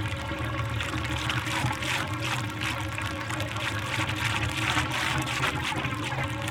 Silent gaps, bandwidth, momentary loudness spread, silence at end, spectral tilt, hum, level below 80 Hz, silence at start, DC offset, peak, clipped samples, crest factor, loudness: none; 18.5 kHz; 5 LU; 0 s; -4 dB/octave; none; -46 dBFS; 0 s; under 0.1%; -10 dBFS; under 0.1%; 20 dB; -28 LUFS